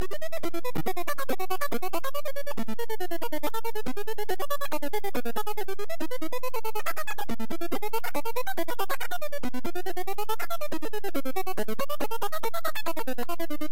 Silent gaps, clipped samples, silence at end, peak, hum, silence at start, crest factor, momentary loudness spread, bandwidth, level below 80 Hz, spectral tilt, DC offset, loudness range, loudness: none; under 0.1%; 0.05 s; -14 dBFS; none; 0 s; 14 dB; 3 LU; 17 kHz; -58 dBFS; -4.5 dB/octave; 10%; 1 LU; -33 LUFS